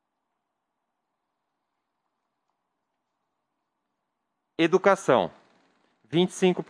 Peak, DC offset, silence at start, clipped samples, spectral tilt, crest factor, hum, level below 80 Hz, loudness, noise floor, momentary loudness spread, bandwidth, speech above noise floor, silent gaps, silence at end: -6 dBFS; under 0.1%; 4.6 s; under 0.1%; -5.5 dB/octave; 24 dB; none; -76 dBFS; -24 LUFS; -81 dBFS; 11 LU; 10.5 kHz; 59 dB; none; 0.05 s